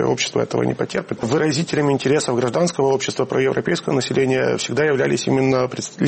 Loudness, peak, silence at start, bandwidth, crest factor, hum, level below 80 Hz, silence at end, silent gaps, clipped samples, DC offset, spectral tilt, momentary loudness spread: -19 LUFS; -6 dBFS; 0 s; 8.8 kHz; 12 dB; none; -56 dBFS; 0 s; none; under 0.1%; under 0.1%; -5 dB/octave; 4 LU